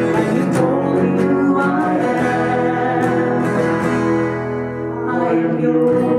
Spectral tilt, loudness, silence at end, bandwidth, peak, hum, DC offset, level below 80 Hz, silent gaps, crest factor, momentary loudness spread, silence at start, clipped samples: -7.5 dB/octave; -17 LUFS; 0 s; 12.5 kHz; -4 dBFS; none; under 0.1%; -50 dBFS; none; 12 dB; 5 LU; 0 s; under 0.1%